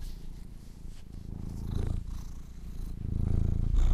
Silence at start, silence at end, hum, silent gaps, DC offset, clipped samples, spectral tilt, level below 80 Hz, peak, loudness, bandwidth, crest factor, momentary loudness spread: 0 s; 0 s; none; none; under 0.1%; under 0.1%; -8 dB/octave; -32 dBFS; -14 dBFS; -36 LUFS; 10 kHz; 18 dB; 18 LU